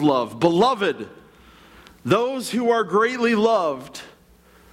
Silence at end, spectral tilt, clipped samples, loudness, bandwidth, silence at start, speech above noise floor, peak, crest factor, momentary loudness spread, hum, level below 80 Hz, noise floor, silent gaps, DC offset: 0.65 s; -5.5 dB/octave; under 0.1%; -20 LUFS; 15.5 kHz; 0 s; 33 dB; -6 dBFS; 16 dB; 16 LU; none; -60 dBFS; -53 dBFS; none; under 0.1%